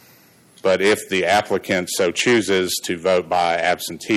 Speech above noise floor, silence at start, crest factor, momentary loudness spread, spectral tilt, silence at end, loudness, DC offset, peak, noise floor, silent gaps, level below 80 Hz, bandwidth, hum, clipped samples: 32 dB; 0.65 s; 14 dB; 5 LU; -3.5 dB/octave; 0 s; -19 LUFS; under 0.1%; -6 dBFS; -51 dBFS; none; -60 dBFS; 15.5 kHz; none; under 0.1%